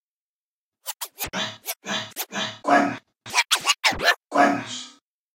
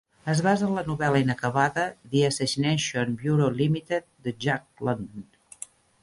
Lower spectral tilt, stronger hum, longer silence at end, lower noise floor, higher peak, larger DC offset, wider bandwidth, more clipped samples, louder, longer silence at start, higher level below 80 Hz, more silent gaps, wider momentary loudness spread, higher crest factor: second, -1.5 dB/octave vs -5.5 dB/octave; neither; second, 0.45 s vs 0.8 s; first, under -90 dBFS vs -46 dBFS; first, -4 dBFS vs -8 dBFS; neither; first, 16 kHz vs 11.5 kHz; neither; first, -23 LUFS vs -26 LUFS; first, 0.85 s vs 0.25 s; about the same, -56 dBFS vs -58 dBFS; neither; about the same, 15 LU vs 14 LU; about the same, 20 dB vs 18 dB